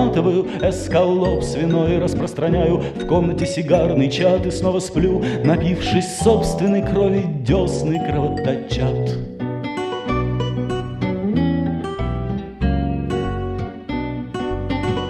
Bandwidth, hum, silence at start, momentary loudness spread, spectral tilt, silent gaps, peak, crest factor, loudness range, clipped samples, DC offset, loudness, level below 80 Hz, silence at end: 12.5 kHz; none; 0 s; 8 LU; -7 dB/octave; none; -2 dBFS; 18 dB; 4 LU; under 0.1%; under 0.1%; -20 LUFS; -32 dBFS; 0 s